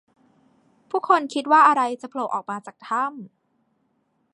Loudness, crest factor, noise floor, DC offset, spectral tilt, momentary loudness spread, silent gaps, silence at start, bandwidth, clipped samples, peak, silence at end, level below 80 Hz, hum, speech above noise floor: -21 LUFS; 20 dB; -69 dBFS; under 0.1%; -4 dB/octave; 16 LU; none; 0.95 s; 11 kHz; under 0.1%; -4 dBFS; 1.05 s; -82 dBFS; none; 48 dB